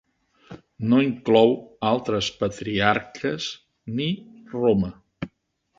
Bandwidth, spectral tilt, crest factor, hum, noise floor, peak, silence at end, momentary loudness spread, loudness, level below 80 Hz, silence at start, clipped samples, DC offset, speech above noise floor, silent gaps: 7.8 kHz; -6 dB/octave; 22 dB; none; -68 dBFS; -2 dBFS; 0.5 s; 17 LU; -23 LUFS; -54 dBFS; 0.5 s; under 0.1%; under 0.1%; 45 dB; none